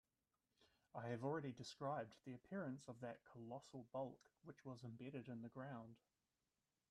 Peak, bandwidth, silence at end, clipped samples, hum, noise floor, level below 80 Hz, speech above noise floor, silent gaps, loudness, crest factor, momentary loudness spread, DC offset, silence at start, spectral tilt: -34 dBFS; 12 kHz; 0.95 s; under 0.1%; none; under -90 dBFS; -88 dBFS; over 38 dB; none; -53 LUFS; 20 dB; 11 LU; under 0.1%; 0.6 s; -6.5 dB/octave